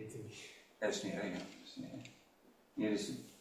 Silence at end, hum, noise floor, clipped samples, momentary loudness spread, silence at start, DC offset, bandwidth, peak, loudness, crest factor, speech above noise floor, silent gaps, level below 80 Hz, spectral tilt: 0 s; none; -68 dBFS; under 0.1%; 15 LU; 0 s; under 0.1%; 16 kHz; -24 dBFS; -43 LUFS; 18 dB; 26 dB; none; -76 dBFS; -4.5 dB/octave